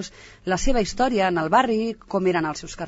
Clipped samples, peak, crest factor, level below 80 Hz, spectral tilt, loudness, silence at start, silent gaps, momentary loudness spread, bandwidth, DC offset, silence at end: under 0.1%; -4 dBFS; 18 dB; -34 dBFS; -4.5 dB/octave; -22 LUFS; 0 s; none; 9 LU; 8 kHz; under 0.1%; 0 s